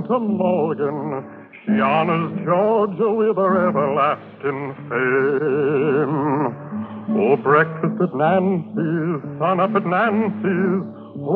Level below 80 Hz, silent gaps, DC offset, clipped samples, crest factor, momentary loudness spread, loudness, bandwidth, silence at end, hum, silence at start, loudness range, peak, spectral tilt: -72 dBFS; none; under 0.1%; under 0.1%; 16 dB; 9 LU; -20 LUFS; 4.5 kHz; 0 s; none; 0 s; 1 LU; -4 dBFS; -10.5 dB/octave